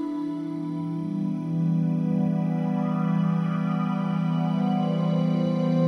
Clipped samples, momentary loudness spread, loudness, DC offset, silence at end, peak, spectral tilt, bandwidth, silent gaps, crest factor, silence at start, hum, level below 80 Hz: under 0.1%; 6 LU; -26 LUFS; under 0.1%; 0 s; -12 dBFS; -9.5 dB/octave; 6 kHz; none; 12 dB; 0 s; none; -70 dBFS